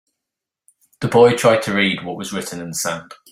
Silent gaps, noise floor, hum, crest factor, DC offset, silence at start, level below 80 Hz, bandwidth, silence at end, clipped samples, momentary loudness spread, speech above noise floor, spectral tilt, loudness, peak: none; -84 dBFS; none; 18 dB; under 0.1%; 1 s; -58 dBFS; 16 kHz; 0.2 s; under 0.1%; 14 LU; 66 dB; -4 dB/octave; -18 LUFS; -2 dBFS